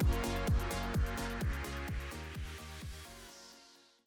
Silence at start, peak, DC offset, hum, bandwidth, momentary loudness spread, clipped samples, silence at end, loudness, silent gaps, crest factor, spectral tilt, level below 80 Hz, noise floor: 0 s; -22 dBFS; under 0.1%; none; 20 kHz; 17 LU; under 0.1%; 0.3 s; -38 LUFS; none; 14 dB; -5.5 dB/octave; -40 dBFS; -62 dBFS